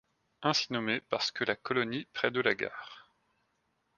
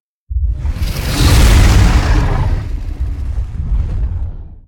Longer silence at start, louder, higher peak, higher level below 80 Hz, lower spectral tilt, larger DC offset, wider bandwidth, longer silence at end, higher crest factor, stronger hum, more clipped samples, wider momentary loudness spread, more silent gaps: about the same, 0.4 s vs 0.3 s; second, -32 LUFS vs -15 LUFS; second, -10 dBFS vs 0 dBFS; second, -74 dBFS vs -14 dBFS; second, -3.5 dB/octave vs -5 dB/octave; neither; second, 9.8 kHz vs 17.5 kHz; first, 0.95 s vs 0.1 s; first, 24 dB vs 12 dB; neither; neither; second, 7 LU vs 13 LU; neither